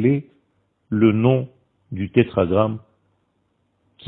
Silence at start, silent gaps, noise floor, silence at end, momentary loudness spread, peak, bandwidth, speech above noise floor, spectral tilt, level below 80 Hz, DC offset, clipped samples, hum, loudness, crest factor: 0 s; none; -68 dBFS; 1.3 s; 17 LU; 0 dBFS; 4 kHz; 50 dB; -12 dB/octave; -54 dBFS; under 0.1%; under 0.1%; none; -20 LUFS; 20 dB